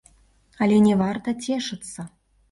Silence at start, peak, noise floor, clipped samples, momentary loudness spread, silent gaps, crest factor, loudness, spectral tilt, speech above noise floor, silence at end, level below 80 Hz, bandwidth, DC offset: 0.6 s; -8 dBFS; -58 dBFS; under 0.1%; 19 LU; none; 16 dB; -22 LUFS; -6 dB/octave; 37 dB; 0.45 s; -58 dBFS; 11.5 kHz; under 0.1%